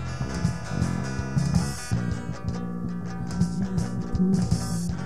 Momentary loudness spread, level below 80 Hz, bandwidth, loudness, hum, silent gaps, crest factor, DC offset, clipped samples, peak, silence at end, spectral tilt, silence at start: 8 LU; -40 dBFS; 13 kHz; -28 LUFS; none; none; 18 dB; 1%; under 0.1%; -8 dBFS; 0 s; -6.5 dB/octave; 0 s